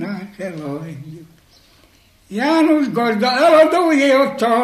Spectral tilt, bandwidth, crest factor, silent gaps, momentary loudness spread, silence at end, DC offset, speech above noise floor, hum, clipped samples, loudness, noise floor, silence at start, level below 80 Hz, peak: -5 dB/octave; 14 kHz; 16 dB; none; 18 LU; 0 s; under 0.1%; 37 dB; none; under 0.1%; -14 LUFS; -52 dBFS; 0 s; -60 dBFS; 0 dBFS